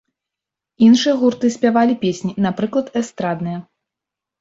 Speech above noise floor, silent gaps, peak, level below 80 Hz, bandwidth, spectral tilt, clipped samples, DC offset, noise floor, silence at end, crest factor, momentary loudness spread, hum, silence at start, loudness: 69 dB; none; -2 dBFS; -60 dBFS; 7.8 kHz; -5.5 dB/octave; under 0.1%; under 0.1%; -85 dBFS; 0.8 s; 16 dB; 11 LU; none; 0.8 s; -17 LUFS